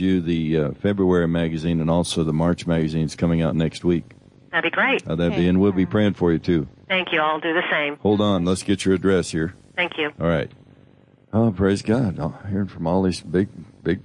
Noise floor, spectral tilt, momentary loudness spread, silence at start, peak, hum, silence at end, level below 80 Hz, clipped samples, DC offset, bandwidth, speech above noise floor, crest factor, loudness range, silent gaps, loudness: -53 dBFS; -6.5 dB/octave; 6 LU; 0 s; -8 dBFS; none; 0.05 s; -48 dBFS; under 0.1%; under 0.1%; 11.5 kHz; 32 dB; 14 dB; 3 LU; none; -21 LUFS